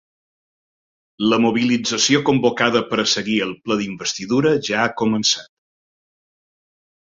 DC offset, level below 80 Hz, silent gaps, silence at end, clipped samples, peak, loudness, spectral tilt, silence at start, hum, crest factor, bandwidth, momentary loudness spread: under 0.1%; -58 dBFS; none; 1.75 s; under 0.1%; -2 dBFS; -18 LUFS; -3.5 dB/octave; 1.2 s; none; 20 dB; 7.8 kHz; 7 LU